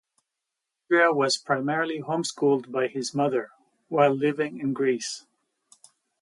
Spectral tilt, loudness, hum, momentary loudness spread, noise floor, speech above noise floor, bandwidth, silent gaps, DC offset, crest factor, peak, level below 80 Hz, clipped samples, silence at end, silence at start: -4.5 dB/octave; -25 LUFS; none; 9 LU; -85 dBFS; 60 dB; 11.5 kHz; none; under 0.1%; 18 dB; -8 dBFS; -78 dBFS; under 0.1%; 1 s; 0.9 s